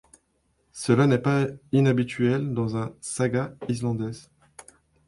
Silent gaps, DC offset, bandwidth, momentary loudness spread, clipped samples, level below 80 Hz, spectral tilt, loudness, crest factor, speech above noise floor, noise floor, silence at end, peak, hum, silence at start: none; under 0.1%; 11.5 kHz; 11 LU; under 0.1%; -58 dBFS; -6.5 dB/octave; -25 LUFS; 18 dB; 46 dB; -70 dBFS; 0.85 s; -8 dBFS; none; 0.75 s